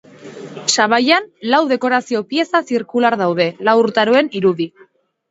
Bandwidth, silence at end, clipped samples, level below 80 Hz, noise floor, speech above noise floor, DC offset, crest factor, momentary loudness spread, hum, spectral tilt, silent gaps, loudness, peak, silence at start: 8 kHz; 0.6 s; under 0.1%; -66 dBFS; -51 dBFS; 36 dB; under 0.1%; 16 dB; 7 LU; none; -3.5 dB/octave; none; -16 LUFS; 0 dBFS; 0.2 s